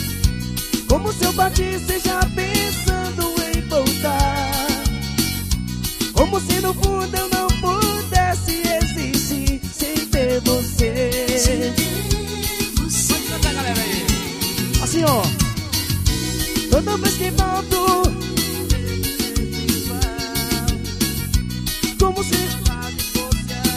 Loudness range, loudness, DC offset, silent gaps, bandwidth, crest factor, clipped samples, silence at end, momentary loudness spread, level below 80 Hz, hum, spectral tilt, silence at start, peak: 2 LU; -20 LUFS; under 0.1%; none; 15.5 kHz; 18 dB; under 0.1%; 0 s; 5 LU; -26 dBFS; none; -4 dB/octave; 0 s; 0 dBFS